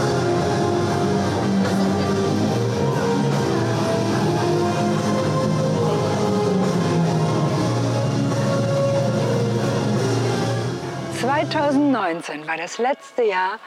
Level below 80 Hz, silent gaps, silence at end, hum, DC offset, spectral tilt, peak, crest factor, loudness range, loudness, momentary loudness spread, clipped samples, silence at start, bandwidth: -54 dBFS; none; 0 s; none; under 0.1%; -6 dB/octave; -10 dBFS; 10 dB; 1 LU; -21 LUFS; 3 LU; under 0.1%; 0 s; 14 kHz